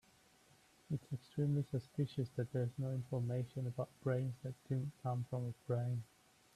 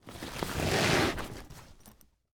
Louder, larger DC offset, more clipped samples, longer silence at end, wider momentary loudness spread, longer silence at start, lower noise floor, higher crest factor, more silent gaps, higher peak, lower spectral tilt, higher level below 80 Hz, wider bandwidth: second, -42 LUFS vs -30 LUFS; neither; neither; about the same, 0.5 s vs 0.4 s; second, 6 LU vs 23 LU; first, 0.9 s vs 0.05 s; first, -69 dBFS vs -59 dBFS; about the same, 16 dB vs 20 dB; neither; second, -26 dBFS vs -14 dBFS; first, -8.5 dB/octave vs -4 dB/octave; second, -72 dBFS vs -48 dBFS; second, 12.5 kHz vs over 20 kHz